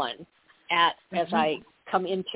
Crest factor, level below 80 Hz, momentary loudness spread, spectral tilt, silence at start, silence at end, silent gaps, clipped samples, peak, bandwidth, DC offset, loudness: 18 dB; -70 dBFS; 11 LU; -8 dB/octave; 0 s; 0 s; none; under 0.1%; -10 dBFS; 4 kHz; under 0.1%; -27 LUFS